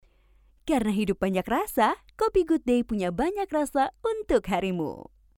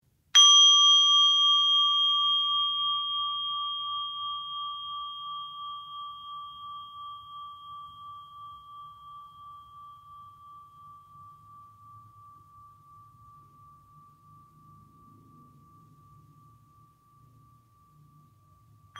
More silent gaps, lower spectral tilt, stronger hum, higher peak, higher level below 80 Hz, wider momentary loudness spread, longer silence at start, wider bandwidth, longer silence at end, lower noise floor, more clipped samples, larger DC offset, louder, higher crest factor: neither; first, -6 dB/octave vs 3 dB/octave; neither; second, -10 dBFS vs -6 dBFS; first, -48 dBFS vs -74 dBFS; second, 6 LU vs 29 LU; first, 0.65 s vs 0.35 s; first, 18.5 kHz vs 14 kHz; first, 0.35 s vs 0 s; about the same, -60 dBFS vs -60 dBFS; neither; neither; second, -26 LUFS vs -21 LUFS; about the same, 18 dB vs 22 dB